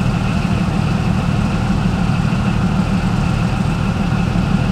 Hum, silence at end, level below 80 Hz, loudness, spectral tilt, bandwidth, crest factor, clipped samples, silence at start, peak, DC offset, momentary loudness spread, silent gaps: none; 0 s; -26 dBFS; -17 LUFS; -7 dB/octave; 12 kHz; 14 dB; under 0.1%; 0 s; -2 dBFS; under 0.1%; 1 LU; none